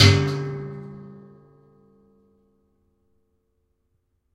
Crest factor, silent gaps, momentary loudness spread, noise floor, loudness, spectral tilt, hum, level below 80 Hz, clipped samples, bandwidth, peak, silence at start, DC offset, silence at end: 24 dB; none; 25 LU; -71 dBFS; -23 LUFS; -5 dB/octave; none; -54 dBFS; under 0.1%; 12.5 kHz; -2 dBFS; 0 s; under 0.1%; 3.2 s